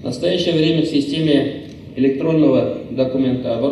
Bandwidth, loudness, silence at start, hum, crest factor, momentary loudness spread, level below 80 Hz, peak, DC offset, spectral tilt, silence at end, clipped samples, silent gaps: 11.5 kHz; -17 LUFS; 0 s; none; 14 dB; 7 LU; -52 dBFS; -4 dBFS; under 0.1%; -7 dB/octave; 0 s; under 0.1%; none